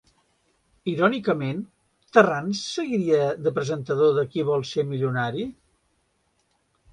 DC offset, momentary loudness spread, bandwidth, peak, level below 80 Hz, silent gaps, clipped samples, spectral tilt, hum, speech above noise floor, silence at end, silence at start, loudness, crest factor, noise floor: under 0.1%; 11 LU; 10.5 kHz; -4 dBFS; -64 dBFS; none; under 0.1%; -6 dB/octave; none; 47 dB; 1.4 s; 0.85 s; -24 LUFS; 22 dB; -70 dBFS